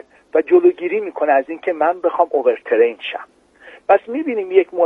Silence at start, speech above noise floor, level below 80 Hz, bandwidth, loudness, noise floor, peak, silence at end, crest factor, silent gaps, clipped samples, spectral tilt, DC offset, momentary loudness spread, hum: 0.35 s; 28 dB; -68 dBFS; 3.9 kHz; -17 LUFS; -44 dBFS; 0 dBFS; 0 s; 16 dB; none; under 0.1%; -6.5 dB/octave; under 0.1%; 10 LU; none